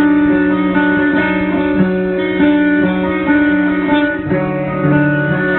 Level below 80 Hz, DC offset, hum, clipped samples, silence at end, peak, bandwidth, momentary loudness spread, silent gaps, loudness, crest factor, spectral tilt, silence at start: -40 dBFS; under 0.1%; none; under 0.1%; 0 s; 0 dBFS; 4.2 kHz; 4 LU; none; -13 LUFS; 12 dB; -11 dB/octave; 0 s